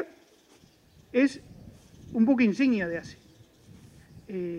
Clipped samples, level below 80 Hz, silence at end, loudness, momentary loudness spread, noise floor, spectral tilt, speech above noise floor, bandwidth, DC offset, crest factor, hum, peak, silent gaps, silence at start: under 0.1%; -62 dBFS; 0 s; -26 LUFS; 18 LU; -59 dBFS; -6.5 dB/octave; 34 dB; 10 kHz; under 0.1%; 18 dB; none; -12 dBFS; none; 0 s